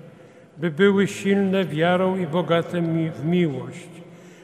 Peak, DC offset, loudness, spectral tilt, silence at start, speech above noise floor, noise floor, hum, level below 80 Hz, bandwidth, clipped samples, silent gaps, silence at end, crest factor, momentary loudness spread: -4 dBFS; under 0.1%; -22 LUFS; -7 dB/octave; 0.05 s; 26 dB; -47 dBFS; none; -68 dBFS; 13 kHz; under 0.1%; none; 0.15 s; 18 dB; 12 LU